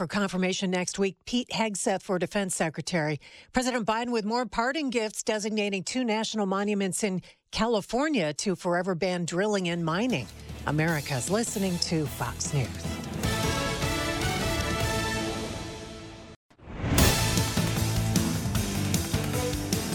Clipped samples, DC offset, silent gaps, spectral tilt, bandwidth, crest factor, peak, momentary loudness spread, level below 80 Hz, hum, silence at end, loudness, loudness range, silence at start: under 0.1%; under 0.1%; 16.36-16.49 s; -4.5 dB/octave; 18 kHz; 22 dB; -6 dBFS; 6 LU; -42 dBFS; none; 0 s; -28 LUFS; 2 LU; 0 s